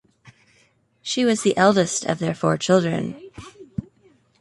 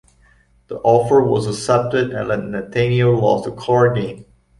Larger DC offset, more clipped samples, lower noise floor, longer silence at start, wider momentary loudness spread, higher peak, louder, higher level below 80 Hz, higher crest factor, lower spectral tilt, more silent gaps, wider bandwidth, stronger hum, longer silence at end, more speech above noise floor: neither; neither; first, -61 dBFS vs -54 dBFS; second, 0.25 s vs 0.7 s; first, 18 LU vs 9 LU; about the same, -2 dBFS vs -2 dBFS; second, -20 LUFS vs -17 LUFS; second, -56 dBFS vs -48 dBFS; about the same, 20 dB vs 16 dB; second, -4.5 dB/octave vs -6.5 dB/octave; neither; about the same, 11.5 kHz vs 11.5 kHz; neither; first, 0.6 s vs 0.35 s; first, 41 dB vs 37 dB